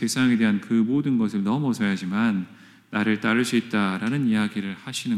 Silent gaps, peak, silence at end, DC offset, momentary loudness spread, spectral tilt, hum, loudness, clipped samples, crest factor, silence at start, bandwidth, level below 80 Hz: none; -8 dBFS; 0 s; under 0.1%; 9 LU; -5.5 dB/octave; none; -23 LUFS; under 0.1%; 16 dB; 0 s; 13.5 kHz; -68 dBFS